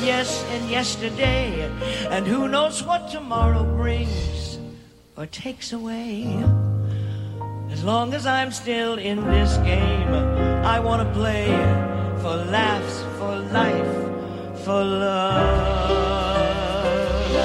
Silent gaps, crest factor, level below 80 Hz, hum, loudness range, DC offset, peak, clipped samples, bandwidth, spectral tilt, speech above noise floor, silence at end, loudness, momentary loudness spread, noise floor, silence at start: none; 16 dB; -30 dBFS; none; 5 LU; under 0.1%; -6 dBFS; under 0.1%; 12 kHz; -5.5 dB/octave; 22 dB; 0 s; -23 LUFS; 10 LU; -44 dBFS; 0 s